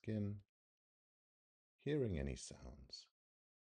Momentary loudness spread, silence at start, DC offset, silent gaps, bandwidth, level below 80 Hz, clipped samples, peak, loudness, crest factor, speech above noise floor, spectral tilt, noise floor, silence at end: 15 LU; 0.05 s; under 0.1%; 0.49-1.79 s; 10.5 kHz; -60 dBFS; under 0.1%; -30 dBFS; -46 LUFS; 18 dB; over 46 dB; -6.5 dB/octave; under -90 dBFS; 0.65 s